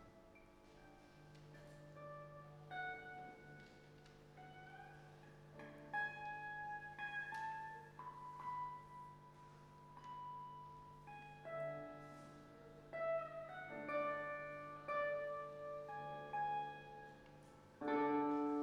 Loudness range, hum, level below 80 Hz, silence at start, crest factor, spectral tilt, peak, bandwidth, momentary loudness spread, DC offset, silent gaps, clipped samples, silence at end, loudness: 9 LU; 50 Hz at -75 dBFS; -74 dBFS; 0 s; 20 dB; -6.5 dB/octave; -28 dBFS; 13 kHz; 20 LU; under 0.1%; none; under 0.1%; 0 s; -47 LUFS